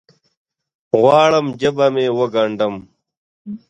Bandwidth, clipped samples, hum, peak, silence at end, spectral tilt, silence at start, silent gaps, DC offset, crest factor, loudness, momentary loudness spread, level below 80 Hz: 9 kHz; under 0.1%; none; 0 dBFS; 0.1 s; -6 dB/octave; 0.95 s; 3.17-3.45 s; under 0.1%; 18 dB; -16 LUFS; 11 LU; -60 dBFS